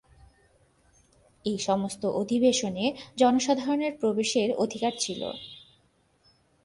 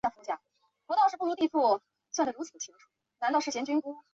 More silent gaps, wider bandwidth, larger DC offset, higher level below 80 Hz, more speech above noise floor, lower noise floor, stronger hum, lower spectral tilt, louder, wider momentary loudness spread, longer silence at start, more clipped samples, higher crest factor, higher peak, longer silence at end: neither; first, 11.5 kHz vs 7.8 kHz; neither; first, -64 dBFS vs -74 dBFS; second, 40 dB vs 45 dB; second, -66 dBFS vs -75 dBFS; neither; first, -4 dB/octave vs -2.5 dB/octave; first, -27 LUFS vs -30 LUFS; about the same, 11 LU vs 13 LU; first, 1.45 s vs 0.05 s; neither; about the same, 20 dB vs 16 dB; first, -10 dBFS vs -14 dBFS; first, 1.05 s vs 0.15 s